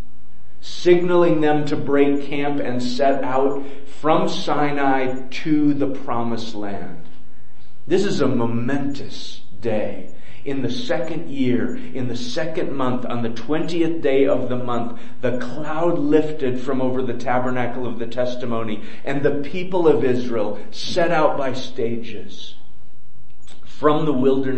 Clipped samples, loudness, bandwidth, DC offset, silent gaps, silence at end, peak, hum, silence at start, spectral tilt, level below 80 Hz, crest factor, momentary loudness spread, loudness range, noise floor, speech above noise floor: under 0.1%; -22 LUFS; 8.6 kHz; 10%; none; 0 s; -2 dBFS; none; 0.65 s; -6.5 dB/octave; -54 dBFS; 20 dB; 12 LU; 5 LU; -53 dBFS; 31 dB